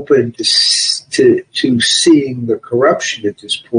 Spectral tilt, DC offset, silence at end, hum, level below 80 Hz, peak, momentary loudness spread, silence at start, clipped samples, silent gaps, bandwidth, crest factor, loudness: -3 dB/octave; under 0.1%; 0 s; none; -56 dBFS; 0 dBFS; 9 LU; 0 s; under 0.1%; none; 10.5 kHz; 12 dB; -12 LUFS